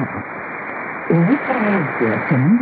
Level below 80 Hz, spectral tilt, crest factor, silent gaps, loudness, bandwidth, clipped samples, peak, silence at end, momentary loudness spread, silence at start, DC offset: -60 dBFS; -13.5 dB/octave; 14 dB; none; -19 LUFS; 4.7 kHz; under 0.1%; -2 dBFS; 0 s; 11 LU; 0 s; under 0.1%